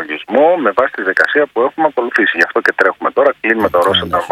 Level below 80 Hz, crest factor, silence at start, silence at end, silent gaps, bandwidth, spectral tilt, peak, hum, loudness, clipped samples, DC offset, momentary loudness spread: -50 dBFS; 14 dB; 0 s; 0 s; none; 14.5 kHz; -4.5 dB/octave; 0 dBFS; none; -13 LUFS; 0.2%; under 0.1%; 3 LU